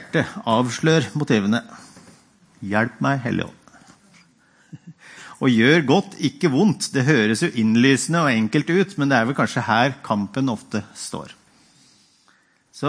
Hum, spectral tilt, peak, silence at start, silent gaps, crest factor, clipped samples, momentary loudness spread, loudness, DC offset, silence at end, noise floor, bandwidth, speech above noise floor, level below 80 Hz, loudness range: none; -5.5 dB/octave; -2 dBFS; 0 s; none; 20 dB; under 0.1%; 12 LU; -20 LUFS; under 0.1%; 0 s; -59 dBFS; 10.5 kHz; 40 dB; -64 dBFS; 8 LU